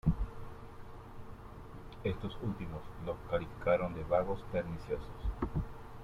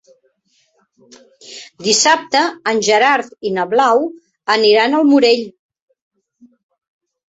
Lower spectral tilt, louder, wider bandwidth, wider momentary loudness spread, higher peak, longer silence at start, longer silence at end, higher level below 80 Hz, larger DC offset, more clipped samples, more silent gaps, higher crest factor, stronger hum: first, -8.5 dB/octave vs -2 dB/octave; second, -38 LUFS vs -14 LUFS; first, 15 kHz vs 8.4 kHz; about the same, 18 LU vs 16 LU; second, -18 dBFS vs 0 dBFS; second, 0.05 s vs 1.5 s; second, 0 s vs 1.8 s; first, -46 dBFS vs -64 dBFS; neither; neither; neither; about the same, 20 dB vs 16 dB; neither